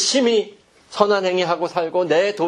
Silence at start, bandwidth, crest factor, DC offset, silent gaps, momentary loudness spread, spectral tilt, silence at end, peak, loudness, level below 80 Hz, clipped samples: 0 s; 11 kHz; 20 dB; under 0.1%; none; 6 LU; -3 dB/octave; 0 s; 0 dBFS; -19 LUFS; -68 dBFS; under 0.1%